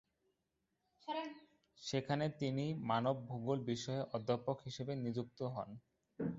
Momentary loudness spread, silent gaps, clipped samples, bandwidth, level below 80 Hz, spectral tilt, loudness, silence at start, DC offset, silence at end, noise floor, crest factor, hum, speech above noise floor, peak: 12 LU; none; under 0.1%; 7.6 kHz; -74 dBFS; -6 dB/octave; -41 LUFS; 1.05 s; under 0.1%; 0 s; -86 dBFS; 20 dB; none; 46 dB; -22 dBFS